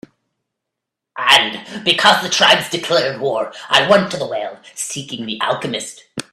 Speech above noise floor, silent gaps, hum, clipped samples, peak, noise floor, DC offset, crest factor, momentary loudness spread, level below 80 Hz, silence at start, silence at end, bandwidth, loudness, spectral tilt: 63 dB; none; none; under 0.1%; 0 dBFS; -81 dBFS; under 0.1%; 18 dB; 14 LU; -60 dBFS; 1.15 s; 0.1 s; 16 kHz; -15 LUFS; -2 dB/octave